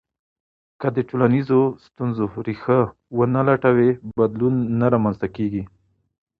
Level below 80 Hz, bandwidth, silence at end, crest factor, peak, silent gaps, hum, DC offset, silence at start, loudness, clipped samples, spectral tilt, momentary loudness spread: -54 dBFS; 5 kHz; 0.75 s; 18 dB; -2 dBFS; none; none; under 0.1%; 0.8 s; -21 LUFS; under 0.1%; -11 dB/octave; 10 LU